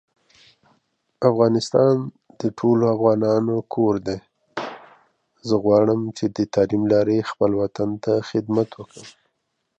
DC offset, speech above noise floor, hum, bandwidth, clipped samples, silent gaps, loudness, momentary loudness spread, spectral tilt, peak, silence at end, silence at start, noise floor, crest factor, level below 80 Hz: under 0.1%; 55 dB; none; 9 kHz; under 0.1%; none; -21 LUFS; 14 LU; -7.5 dB/octave; -2 dBFS; 0.7 s; 1.2 s; -74 dBFS; 18 dB; -58 dBFS